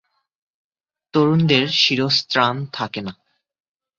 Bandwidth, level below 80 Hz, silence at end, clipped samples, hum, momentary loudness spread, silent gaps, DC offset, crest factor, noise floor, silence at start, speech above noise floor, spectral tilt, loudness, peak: 7.6 kHz; -60 dBFS; 0.85 s; under 0.1%; none; 12 LU; none; under 0.1%; 20 dB; -48 dBFS; 1.15 s; 30 dB; -5 dB/octave; -18 LUFS; -2 dBFS